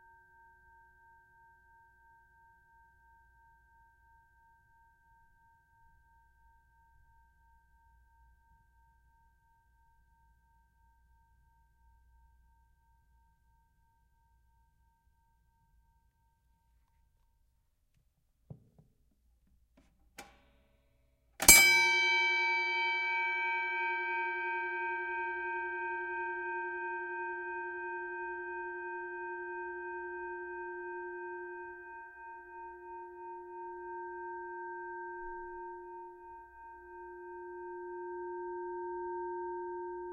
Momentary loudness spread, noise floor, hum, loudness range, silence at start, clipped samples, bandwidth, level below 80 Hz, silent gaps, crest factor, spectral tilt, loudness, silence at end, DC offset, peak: 22 LU; -74 dBFS; none; 20 LU; 18.5 s; under 0.1%; 16 kHz; -64 dBFS; none; 34 dB; -0.5 dB/octave; -32 LUFS; 0 s; under 0.1%; -4 dBFS